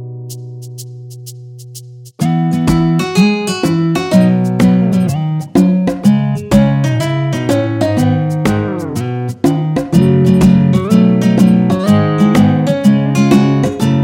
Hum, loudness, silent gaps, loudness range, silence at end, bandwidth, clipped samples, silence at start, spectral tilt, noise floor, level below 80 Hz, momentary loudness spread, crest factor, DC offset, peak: none; -12 LUFS; none; 5 LU; 0 s; 16.5 kHz; under 0.1%; 0 s; -7.5 dB/octave; -32 dBFS; -38 dBFS; 18 LU; 12 dB; under 0.1%; 0 dBFS